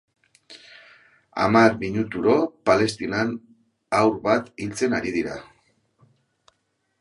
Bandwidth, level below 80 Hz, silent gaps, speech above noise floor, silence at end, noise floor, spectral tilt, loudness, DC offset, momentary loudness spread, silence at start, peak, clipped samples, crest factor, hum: 11.5 kHz; -56 dBFS; none; 51 dB; 1.6 s; -72 dBFS; -5.5 dB/octave; -22 LUFS; under 0.1%; 17 LU; 0.5 s; -2 dBFS; under 0.1%; 22 dB; none